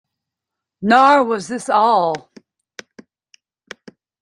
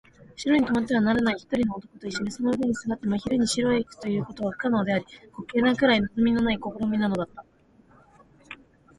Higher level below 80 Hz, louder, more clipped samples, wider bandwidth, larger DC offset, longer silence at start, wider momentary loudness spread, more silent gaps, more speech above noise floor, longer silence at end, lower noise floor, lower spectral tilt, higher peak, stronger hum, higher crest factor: second, -66 dBFS vs -52 dBFS; first, -15 LUFS vs -25 LUFS; neither; about the same, 11 kHz vs 11.5 kHz; neither; first, 0.8 s vs 0.4 s; about the same, 13 LU vs 13 LU; neither; first, 69 dB vs 33 dB; first, 2 s vs 0.45 s; first, -83 dBFS vs -58 dBFS; about the same, -4.5 dB/octave vs -5 dB/octave; first, -2 dBFS vs -8 dBFS; neither; about the same, 18 dB vs 18 dB